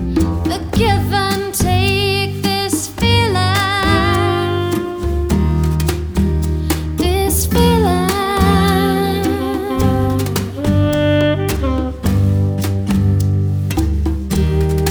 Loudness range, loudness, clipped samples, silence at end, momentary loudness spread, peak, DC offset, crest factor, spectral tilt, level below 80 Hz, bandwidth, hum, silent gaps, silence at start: 2 LU; -16 LUFS; under 0.1%; 0 s; 6 LU; 0 dBFS; under 0.1%; 14 dB; -5.5 dB/octave; -24 dBFS; over 20 kHz; none; none; 0 s